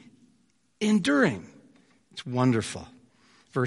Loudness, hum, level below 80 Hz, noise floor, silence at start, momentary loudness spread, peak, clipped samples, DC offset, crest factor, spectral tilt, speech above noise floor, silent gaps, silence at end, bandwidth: -26 LUFS; none; -64 dBFS; -68 dBFS; 0.8 s; 18 LU; -10 dBFS; under 0.1%; under 0.1%; 20 dB; -5.5 dB/octave; 43 dB; none; 0 s; 11.5 kHz